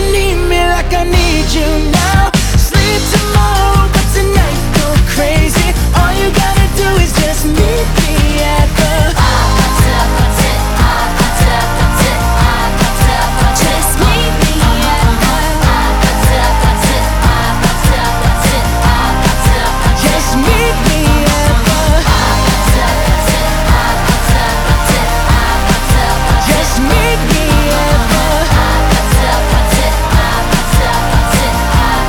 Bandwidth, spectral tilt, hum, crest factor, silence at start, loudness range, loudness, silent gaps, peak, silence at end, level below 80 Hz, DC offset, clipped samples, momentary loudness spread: over 20 kHz; -4.5 dB/octave; none; 10 dB; 0 s; 1 LU; -11 LUFS; none; 0 dBFS; 0 s; -14 dBFS; under 0.1%; 0.2%; 2 LU